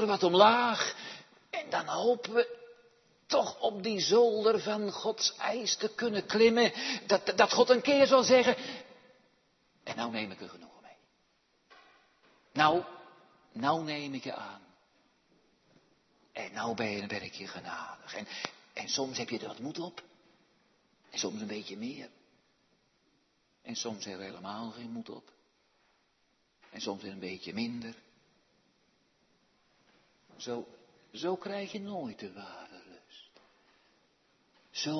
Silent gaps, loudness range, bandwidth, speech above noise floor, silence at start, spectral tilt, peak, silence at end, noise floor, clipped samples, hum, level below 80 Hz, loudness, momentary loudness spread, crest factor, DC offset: none; 16 LU; 6.2 kHz; 43 dB; 0 s; -2 dB/octave; -8 dBFS; 0 s; -74 dBFS; under 0.1%; none; -78 dBFS; -31 LUFS; 22 LU; 26 dB; under 0.1%